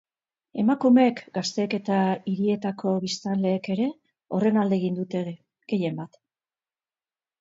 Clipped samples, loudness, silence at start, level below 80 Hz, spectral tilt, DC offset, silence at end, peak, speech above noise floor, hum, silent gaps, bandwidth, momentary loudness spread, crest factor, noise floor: under 0.1%; -25 LUFS; 0.55 s; -72 dBFS; -6.5 dB/octave; under 0.1%; 1.35 s; -8 dBFS; over 66 dB; none; none; 7.8 kHz; 12 LU; 18 dB; under -90 dBFS